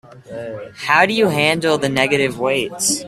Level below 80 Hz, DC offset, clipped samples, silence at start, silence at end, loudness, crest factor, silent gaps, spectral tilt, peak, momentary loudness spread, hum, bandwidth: -56 dBFS; under 0.1%; under 0.1%; 0.1 s; 0 s; -16 LUFS; 18 dB; none; -3 dB/octave; 0 dBFS; 16 LU; none; 15.5 kHz